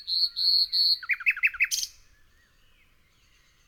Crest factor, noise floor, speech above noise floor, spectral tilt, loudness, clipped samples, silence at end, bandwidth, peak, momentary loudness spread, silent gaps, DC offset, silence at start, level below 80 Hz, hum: 18 dB; -62 dBFS; 37 dB; 5 dB/octave; -23 LUFS; under 0.1%; 1.8 s; over 20 kHz; -12 dBFS; 6 LU; none; under 0.1%; 0 s; -64 dBFS; none